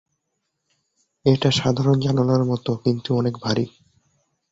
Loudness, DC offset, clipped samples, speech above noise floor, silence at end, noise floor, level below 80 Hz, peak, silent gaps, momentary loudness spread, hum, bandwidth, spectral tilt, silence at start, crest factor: -21 LUFS; under 0.1%; under 0.1%; 57 dB; 0.85 s; -76 dBFS; -54 dBFS; -4 dBFS; none; 5 LU; none; 7.8 kHz; -6.5 dB/octave; 1.25 s; 18 dB